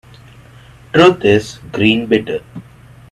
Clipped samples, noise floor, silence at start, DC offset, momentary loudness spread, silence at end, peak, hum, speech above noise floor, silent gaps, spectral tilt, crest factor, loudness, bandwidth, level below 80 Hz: under 0.1%; -41 dBFS; 0.95 s; under 0.1%; 17 LU; 0.5 s; 0 dBFS; none; 28 dB; none; -6 dB/octave; 16 dB; -13 LUFS; 12.5 kHz; -46 dBFS